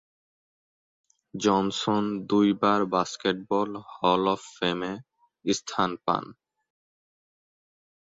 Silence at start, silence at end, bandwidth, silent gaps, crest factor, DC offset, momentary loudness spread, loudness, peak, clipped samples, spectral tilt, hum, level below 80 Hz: 1.35 s; 1.8 s; 7.8 kHz; none; 20 dB; under 0.1%; 10 LU; -26 LUFS; -8 dBFS; under 0.1%; -5 dB/octave; none; -64 dBFS